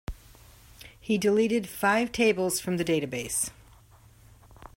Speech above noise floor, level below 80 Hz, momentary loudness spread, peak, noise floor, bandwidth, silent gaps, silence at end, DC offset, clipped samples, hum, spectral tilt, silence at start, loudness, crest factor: 29 dB; -52 dBFS; 7 LU; -12 dBFS; -55 dBFS; 16.5 kHz; none; 0.1 s; under 0.1%; under 0.1%; none; -4 dB/octave; 0.1 s; -26 LUFS; 18 dB